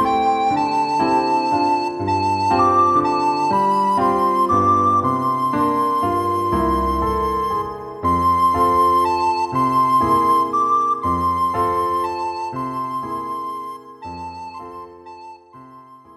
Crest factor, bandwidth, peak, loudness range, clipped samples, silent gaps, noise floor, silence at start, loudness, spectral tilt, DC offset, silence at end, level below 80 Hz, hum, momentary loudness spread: 14 dB; 14.5 kHz; -6 dBFS; 9 LU; under 0.1%; none; -43 dBFS; 0 s; -18 LUFS; -6.5 dB/octave; under 0.1%; 0.2 s; -40 dBFS; none; 15 LU